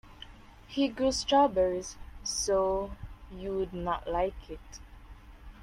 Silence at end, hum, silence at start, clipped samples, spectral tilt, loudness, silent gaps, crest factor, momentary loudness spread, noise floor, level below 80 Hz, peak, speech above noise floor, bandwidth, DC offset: 0 s; none; 0.05 s; under 0.1%; -4 dB/octave; -30 LUFS; none; 18 dB; 23 LU; -51 dBFS; -48 dBFS; -12 dBFS; 22 dB; 14 kHz; under 0.1%